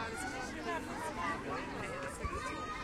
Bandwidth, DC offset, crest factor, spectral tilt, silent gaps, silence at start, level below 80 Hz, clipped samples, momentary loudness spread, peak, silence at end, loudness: 16 kHz; under 0.1%; 14 dB; -4 dB/octave; none; 0 s; -52 dBFS; under 0.1%; 3 LU; -26 dBFS; 0 s; -40 LUFS